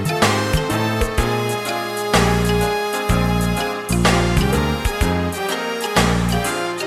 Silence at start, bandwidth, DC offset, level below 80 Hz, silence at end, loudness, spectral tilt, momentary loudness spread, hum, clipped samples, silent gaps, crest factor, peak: 0 s; 16 kHz; under 0.1%; -28 dBFS; 0 s; -19 LUFS; -5 dB/octave; 6 LU; none; under 0.1%; none; 16 dB; -2 dBFS